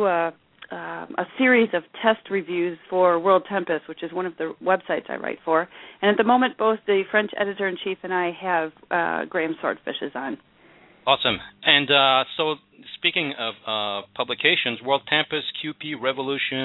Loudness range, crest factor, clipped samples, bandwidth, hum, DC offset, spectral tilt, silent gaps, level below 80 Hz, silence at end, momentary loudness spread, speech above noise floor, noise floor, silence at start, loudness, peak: 4 LU; 22 dB; under 0.1%; 4.1 kHz; none; under 0.1%; -7 dB/octave; none; -66 dBFS; 0 s; 12 LU; 30 dB; -53 dBFS; 0 s; -23 LUFS; -2 dBFS